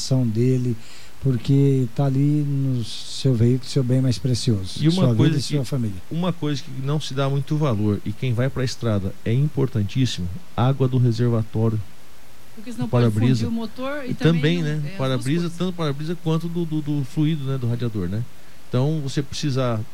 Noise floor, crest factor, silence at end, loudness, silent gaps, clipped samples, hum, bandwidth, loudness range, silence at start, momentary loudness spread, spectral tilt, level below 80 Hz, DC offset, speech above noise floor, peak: -49 dBFS; 14 dB; 0.05 s; -22 LUFS; none; under 0.1%; none; 14.5 kHz; 4 LU; 0 s; 8 LU; -7 dB/octave; -50 dBFS; 3%; 28 dB; -6 dBFS